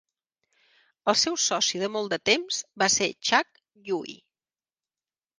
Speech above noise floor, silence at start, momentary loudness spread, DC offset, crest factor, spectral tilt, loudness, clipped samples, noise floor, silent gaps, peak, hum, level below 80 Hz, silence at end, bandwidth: over 64 dB; 1.05 s; 10 LU; under 0.1%; 24 dB; -1 dB/octave; -25 LUFS; under 0.1%; under -90 dBFS; none; -4 dBFS; none; -70 dBFS; 1.25 s; 10.5 kHz